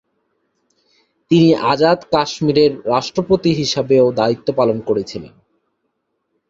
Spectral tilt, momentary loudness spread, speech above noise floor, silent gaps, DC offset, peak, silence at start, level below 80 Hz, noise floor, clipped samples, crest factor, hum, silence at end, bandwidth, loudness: -6 dB/octave; 7 LU; 56 dB; none; under 0.1%; 0 dBFS; 1.3 s; -52 dBFS; -71 dBFS; under 0.1%; 16 dB; none; 1.2 s; 7.8 kHz; -15 LUFS